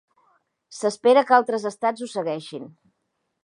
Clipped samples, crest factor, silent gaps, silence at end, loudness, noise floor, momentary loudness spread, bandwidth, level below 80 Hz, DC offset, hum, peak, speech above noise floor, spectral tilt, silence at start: under 0.1%; 22 dB; none; 0.75 s; -22 LUFS; -76 dBFS; 20 LU; 11 kHz; -80 dBFS; under 0.1%; none; -2 dBFS; 54 dB; -4 dB/octave; 0.7 s